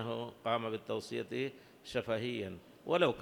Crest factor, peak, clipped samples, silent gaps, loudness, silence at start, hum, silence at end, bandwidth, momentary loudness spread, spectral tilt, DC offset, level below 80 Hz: 22 dB; -16 dBFS; under 0.1%; none; -37 LUFS; 0 s; none; 0 s; 20 kHz; 10 LU; -5.5 dB/octave; under 0.1%; -70 dBFS